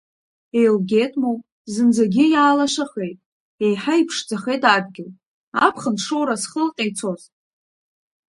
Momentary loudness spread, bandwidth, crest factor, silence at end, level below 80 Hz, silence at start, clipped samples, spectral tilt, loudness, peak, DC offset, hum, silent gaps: 14 LU; 11.5 kHz; 20 dB; 1.15 s; -68 dBFS; 0.55 s; under 0.1%; -4.5 dB/octave; -19 LUFS; 0 dBFS; under 0.1%; none; 1.52-1.65 s, 3.26-3.58 s, 5.26-5.52 s